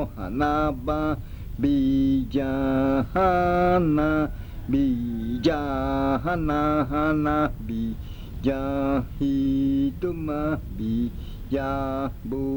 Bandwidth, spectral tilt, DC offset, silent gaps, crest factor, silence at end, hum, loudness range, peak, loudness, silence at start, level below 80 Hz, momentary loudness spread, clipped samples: over 20 kHz; -8.5 dB/octave; under 0.1%; none; 14 dB; 0 s; none; 4 LU; -10 dBFS; -25 LUFS; 0 s; -36 dBFS; 9 LU; under 0.1%